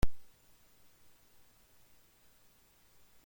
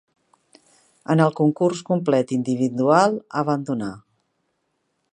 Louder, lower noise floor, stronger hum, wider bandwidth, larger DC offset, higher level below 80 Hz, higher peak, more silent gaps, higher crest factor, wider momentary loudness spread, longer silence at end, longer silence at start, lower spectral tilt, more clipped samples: second, -56 LUFS vs -21 LUFS; second, -65 dBFS vs -72 dBFS; neither; first, 16.5 kHz vs 10.5 kHz; neither; first, -48 dBFS vs -68 dBFS; second, -16 dBFS vs -2 dBFS; neither; about the same, 22 dB vs 20 dB; second, 0 LU vs 10 LU; second, 0 s vs 1.15 s; second, 0 s vs 1.1 s; about the same, -6 dB/octave vs -7 dB/octave; neither